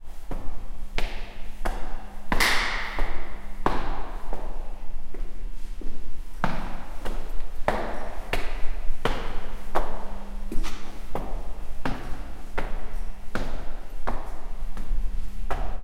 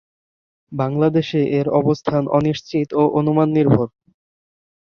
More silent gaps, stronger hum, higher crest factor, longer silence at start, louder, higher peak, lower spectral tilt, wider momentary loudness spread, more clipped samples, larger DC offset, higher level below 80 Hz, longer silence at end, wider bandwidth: neither; neither; about the same, 16 dB vs 18 dB; second, 0 s vs 0.7 s; second, -33 LUFS vs -18 LUFS; second, -6 dBFS vs -2 dBFS; second, -4 dB/octave vs -8.5 dB/octave; first, 12 LU vs 6 LU; neither; neither; first, -28 dBFS vs -54 dBFS; second, 0 s vs 1 s; first, 12 kHz vs 6.8 kHz